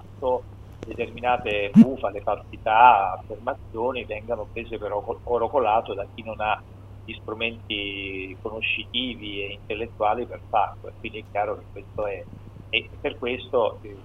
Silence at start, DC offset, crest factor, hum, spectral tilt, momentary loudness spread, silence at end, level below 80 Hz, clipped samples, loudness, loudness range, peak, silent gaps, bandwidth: 0 s; under 0.1%; 22 dB; none; -7.5 dB/octave; 17 LU; 0 s; -48 dBFS; under 0.1%; -25 LUFS; 8 LU; -2 dBFS; none; 6.4 kHz